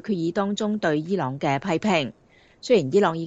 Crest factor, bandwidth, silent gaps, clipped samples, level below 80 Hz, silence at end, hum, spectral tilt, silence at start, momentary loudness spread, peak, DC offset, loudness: 16 dB; 8 kHz; none; under 0.1%; -64 dBFS; 0 s; none; -6 dB/octave; 0.05 s; 6 LU; -6 dBFS; under 0.1%; -23 LUFS